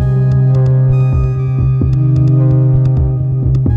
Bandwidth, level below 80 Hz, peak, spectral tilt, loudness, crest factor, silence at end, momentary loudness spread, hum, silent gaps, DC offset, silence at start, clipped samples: 2.6 kHz; -22 dBFS; -2 dBFS; -11.5 dB/octave; -12 LUFS; 8 dB; 0 s; 4 LU; none; none; under 0.1%; 0 s; under 0.1%